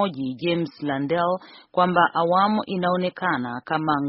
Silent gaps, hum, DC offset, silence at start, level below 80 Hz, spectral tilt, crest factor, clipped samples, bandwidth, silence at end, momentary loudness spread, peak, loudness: none; none; under 0.1%; 0 s; -62 dBFS; -4 dB/octave; 20 dB; under 0.1%; 5.8 kHz; 0 s; 8 LU; -4 dBFS; -23 LUFS